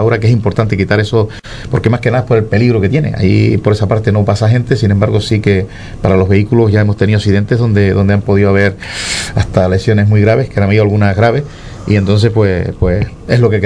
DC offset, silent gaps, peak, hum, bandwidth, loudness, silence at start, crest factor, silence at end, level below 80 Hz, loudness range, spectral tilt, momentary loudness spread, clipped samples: under 0.1%; none; 0 dBFS; none; 10.5 kHz; -11 LUFS; 0 s; 10 dB; 0 s; -30 dBFS; 1 LU; -7 dB/octave; 5 LU; 0.2%